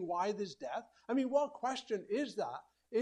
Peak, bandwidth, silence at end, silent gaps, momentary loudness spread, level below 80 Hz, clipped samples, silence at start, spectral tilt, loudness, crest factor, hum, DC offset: -20 dBFS; 10.5 kHz; 0 s; none; 10 LU; -82 dBFS; under 0.1%; 0 s; -5 dB/octave; -38 LUFS; 18 dB; none; under 0.1%